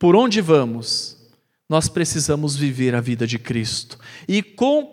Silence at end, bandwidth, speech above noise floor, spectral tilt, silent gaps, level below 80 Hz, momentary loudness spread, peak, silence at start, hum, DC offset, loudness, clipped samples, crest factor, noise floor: 0.05 s; 16 kHz; 38 dB; -5 dB/octave; none; -50 dBFS; 9 LU; -2 dBFS; 0 s; none; under 0.1%; -20 LUFS; under 0.1%; 18 dB; -57 dBFS